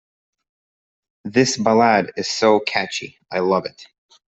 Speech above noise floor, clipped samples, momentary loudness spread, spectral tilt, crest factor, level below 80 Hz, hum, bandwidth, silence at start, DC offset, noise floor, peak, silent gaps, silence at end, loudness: over 71 dB; under 0.1%; 12 LU; -4 dB/octave; 18 dB; -62 dBFS; none; 8.4 kHz; 1.25 s; under 0.1%; under -90 dBFS; -2 dBFS; none; 0.5 s; -19 LUFS